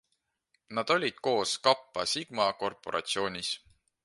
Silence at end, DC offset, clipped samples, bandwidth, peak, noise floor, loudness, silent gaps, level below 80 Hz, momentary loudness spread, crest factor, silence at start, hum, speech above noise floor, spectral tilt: 0.45 s; under 0.1%; under 0.1%; 11.5 kHz; -8 dBFS; -80 dBFS; -30 LUFS; none; -70 dBFS; 8 LU; 24 dB; 0.7 s; none; 50 dB; -2.5 dB/octave